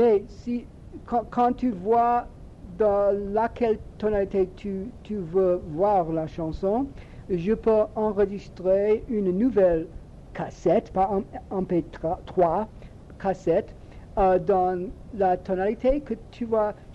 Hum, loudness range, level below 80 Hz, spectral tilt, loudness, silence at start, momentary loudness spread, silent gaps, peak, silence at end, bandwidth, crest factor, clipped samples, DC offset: none; 2 LU; -44 dBFS; -8.5 dB/octave; -25 LUFS; 0 s; 12 LU; none; -10 dBFS; 0 s; 8 kHz; 16 dB; under 0.1%; under 0.1%